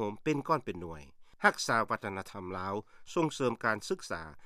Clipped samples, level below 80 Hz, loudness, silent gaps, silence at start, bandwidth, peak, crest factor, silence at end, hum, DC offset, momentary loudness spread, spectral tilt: under 0.1%; -64 dBFS; -33 LUFS; none; 0 s; 15 kHz; -10 dBFS; 24 dB; 0 s; none; under 0.1%; 12 LU; -4.5 dB/octave